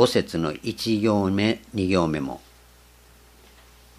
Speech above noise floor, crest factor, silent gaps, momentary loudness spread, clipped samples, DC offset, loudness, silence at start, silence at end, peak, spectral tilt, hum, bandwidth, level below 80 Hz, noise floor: 30 dB; 22 dB; none; 8 LU; under 0.1%; under 0.1%; -24 LUFS; 0 s; 1.6 s; -4 dBFS; -6 dB/octave; 60 Hz at -50 dBFS; 15.5 kHz; -52 dBFS; -52 dBFS